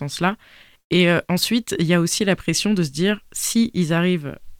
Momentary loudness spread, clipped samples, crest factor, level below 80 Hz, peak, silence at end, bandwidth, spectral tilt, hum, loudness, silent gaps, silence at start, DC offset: 6 LU; under 0.1%; 16 dB; -50 dBFS; -4 dBFS; 0.05 s; 16.5 kHz; -4.5 dB/octave; none; -20 LUFS; 0.84-0.90 s; 0 s; under 0.1%